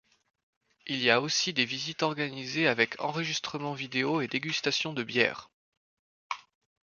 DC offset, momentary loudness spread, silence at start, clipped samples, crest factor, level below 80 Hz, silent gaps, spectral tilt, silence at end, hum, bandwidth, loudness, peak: under 0.1%; 14 LU; 0.85 s; under 0.1%; 26 dB; -74 dBFS; 5.54-6.30 s; -3 dB/octave; 0.45 s; none; 7.4 kHz; -29 LUFS; -6 dBFS